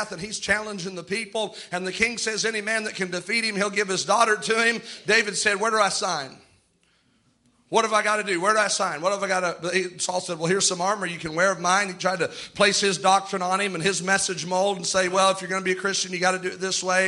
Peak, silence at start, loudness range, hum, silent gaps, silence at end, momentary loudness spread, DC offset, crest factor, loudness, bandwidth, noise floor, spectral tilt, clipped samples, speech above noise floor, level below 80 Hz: -6 dBFS; 0 s; 3 LU; none; none; 0 s; 8 LU; under 0.1%; 20 dB; -23 LUFS; 11.5 kHz; -65 dBFS; -2.5 dB/octave; under 0.1%; 41 dB; -62 dBFS